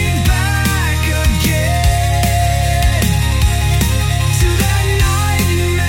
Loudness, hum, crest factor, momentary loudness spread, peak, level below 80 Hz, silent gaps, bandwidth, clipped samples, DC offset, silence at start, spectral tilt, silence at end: -14 LUFS; none; 12 dB; 1 LU; -2 dBFS; -18 dBFS; none; 17 kHz; under 0.1%; under 0.1%; 0 s; -4.5 dB/octave; 0 s